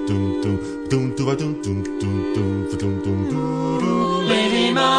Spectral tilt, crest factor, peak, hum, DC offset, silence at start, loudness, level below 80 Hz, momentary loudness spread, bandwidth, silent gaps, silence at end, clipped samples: -6 dB/octave; 16 dB; -4 dBFS; none; under 0.1%; 0 s; -21 LUFS; -46 dBFS; 6 LU; 10.5 kHz; none; 0 s; under 0.1%